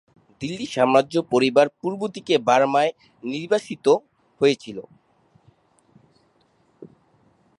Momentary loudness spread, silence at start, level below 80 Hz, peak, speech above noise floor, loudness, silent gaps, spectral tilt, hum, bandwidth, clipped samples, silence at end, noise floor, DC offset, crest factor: 14 LU; 0.4 s; -68 dBFS; -4 dBFS; 42 dB; -21 LUFS; none; -5 dB/octave; none; 11.5 kHz; under 0.1%; 0.75 s; -62 dBFS; under 0.1%; 20 dB